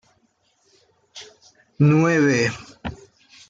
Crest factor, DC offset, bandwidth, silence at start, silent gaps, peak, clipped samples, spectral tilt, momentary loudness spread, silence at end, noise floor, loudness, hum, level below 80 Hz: 18 dB; under 0.1%; 7.6 kHz; 1.15 s; none; -6 dBFS; under 0.1%; -6.5 dB/octave; 24 LU; 0.55 s; -65 dBFS; -18 LUFS; none; -54 dBFS